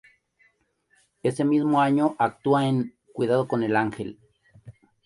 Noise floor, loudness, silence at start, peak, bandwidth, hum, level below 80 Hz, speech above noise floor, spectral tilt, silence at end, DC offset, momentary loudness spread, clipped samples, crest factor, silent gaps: -68 dBFS; -24 LUFS; 1.25 s; -8 dBFS; 11.5 kHz; none; -64 dBFS; 45 dB; -7.5 dB/octave; 0.35 s; under 0.1%; 9 LU; under 0.1%; 16 dB; none